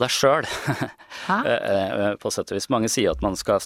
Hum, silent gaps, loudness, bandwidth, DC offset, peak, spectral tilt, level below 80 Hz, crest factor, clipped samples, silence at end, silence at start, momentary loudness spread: none; none; -23 LUFS; 16.5 kHz; under 0.1%; -6 dBFS; -4 dB/octave; -44 dBFS; 18 dB; under 0.1%; 0 s; 0 s; 8 LU